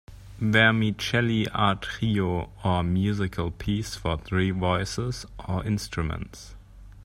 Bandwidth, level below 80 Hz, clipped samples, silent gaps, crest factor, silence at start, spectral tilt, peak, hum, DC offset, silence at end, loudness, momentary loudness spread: 15 kHz; -44 dBFS; under 0.1%; none; 22 dB; 0.1 s; -5.5 dB/octave; -4 dBFS; none; under 0.1%; 0 s; -26 LUFS; 11 LU